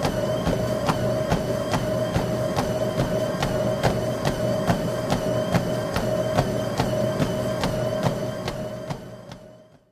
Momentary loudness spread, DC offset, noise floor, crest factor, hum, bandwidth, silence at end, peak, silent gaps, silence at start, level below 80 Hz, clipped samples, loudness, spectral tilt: 7 LU; under 0.1%; -48 dBFS; 18 dB; none; 15.5 kHz; 0.3 s; -6 dBFS; none; 0 s; -40 dBFS; under 0.1%; -25 LUFS; -6 dB/octave